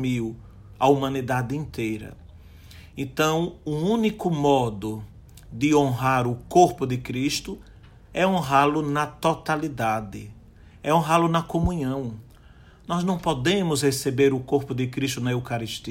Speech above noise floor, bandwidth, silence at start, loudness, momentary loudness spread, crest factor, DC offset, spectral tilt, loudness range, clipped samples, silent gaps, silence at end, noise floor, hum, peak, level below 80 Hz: 26 dB; 16.5 kHz; 0 s; -24 LUFS; 14 LU; 20 dB; under 0.1%; -5.5 dB/octave; 3 LU; under 0.1%; none; 0 s; -50 dBFS; none; -4 dBFS; -46 dBFS